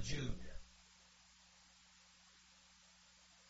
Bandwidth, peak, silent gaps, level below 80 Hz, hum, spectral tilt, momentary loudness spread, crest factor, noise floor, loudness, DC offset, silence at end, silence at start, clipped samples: 7.6 kHz; -28 dBFS; none; -56 dBFS; none; -4.5 dB/octave; 18 LU; 20 dB; -67 dBFS; -55 LUFS; under 0.1%; 0 s; 0 s; under 0.1%